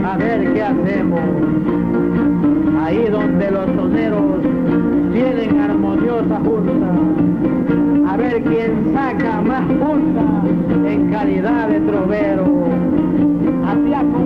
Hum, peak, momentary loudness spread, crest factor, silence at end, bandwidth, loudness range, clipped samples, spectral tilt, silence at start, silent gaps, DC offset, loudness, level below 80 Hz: none; -4 dBFS; 2 LU; 12 dB; 0 s; 5 kHz; 0 LU; under 0.1%; -10 dB/octave; 0 s; none; under 0.1%; -16 LUFS; -38 dBFS